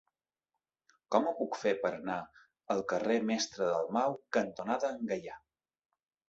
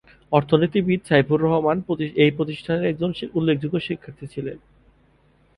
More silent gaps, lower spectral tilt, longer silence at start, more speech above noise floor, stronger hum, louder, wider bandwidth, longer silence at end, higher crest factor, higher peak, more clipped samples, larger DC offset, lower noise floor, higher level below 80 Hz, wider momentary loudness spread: neither; second, -3.5 dB/octave vs -8 dB/octave; first, 1.1 s vs 0.3 s; first, 57 dB vs 38 dB; neither; second, -34 LUFS vs -22 LUFS; second, 8 kHz vs 11 kHz; about the same, 0.9 s vs 1 s; about the same, 22 dB vs 20 dB; second, -12 dBFS vs -2 dBFS; neither; neither; first, -90 dBFS vs -59 dBFS; second, -76 dBFS vs -54 dBFS; second, 8 LU vs 13 LU